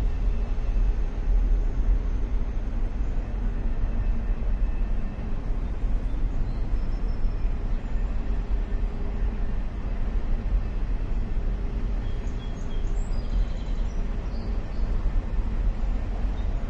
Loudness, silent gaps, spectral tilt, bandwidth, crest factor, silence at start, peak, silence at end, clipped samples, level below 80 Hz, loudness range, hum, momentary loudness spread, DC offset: -31 LUFS; none; -8 dB/octave; 5.6 kHz; 12 dB; 0 s; -12 dBFS; 0 s; under 0.1%; -26 dBFS; 2 LU; none; 4 LU; under 0.1%